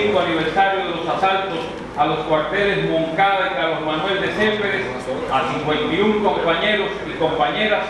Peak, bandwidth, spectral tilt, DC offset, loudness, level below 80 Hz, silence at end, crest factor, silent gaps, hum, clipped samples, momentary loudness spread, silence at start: -4 dBFS; 11 kHz; -5.5 dB/octave; under 0.1%; -19 LUFS; -46 dBFS; 0 s; 16 dB; none; none; under 0.1%; 5 LU; 0 s